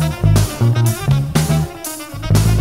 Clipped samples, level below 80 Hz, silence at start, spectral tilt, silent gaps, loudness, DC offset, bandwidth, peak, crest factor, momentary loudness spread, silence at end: under 0.1%; -26 dBFS; 0 s; -6 dB/octave; none; -16 LUFS; 0.4%; 16.5 kHz; 0 dBFS; 14 dB; 11 LU; 0 s